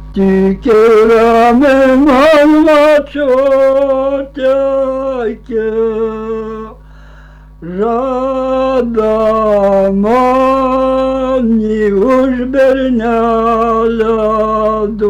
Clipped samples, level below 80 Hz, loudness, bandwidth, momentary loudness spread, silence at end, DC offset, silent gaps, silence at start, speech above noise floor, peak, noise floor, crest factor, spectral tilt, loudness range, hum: under 0.1%; -34 dBFS; -11 LUFS; 13 kHz; 10 LU; 0 s; under 0.1%; none; 0 s; 26 dB; -4 dBFS; -35 dBFS; 6 dB; -7 dB/octave; 9 LU; 50 Hz at -35 dBFS